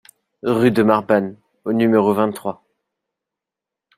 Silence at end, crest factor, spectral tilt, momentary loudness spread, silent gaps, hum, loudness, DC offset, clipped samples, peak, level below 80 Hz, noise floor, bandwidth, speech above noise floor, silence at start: 1.45 s; 18 dB; -7 dB/octave; 15 LU; none; none; -18 LUFS; under 0.1%; under 0.1%; -2 dBFS; -62 dBFS; -86 dBFS; 15 kHz; 69 dB; 0.45 s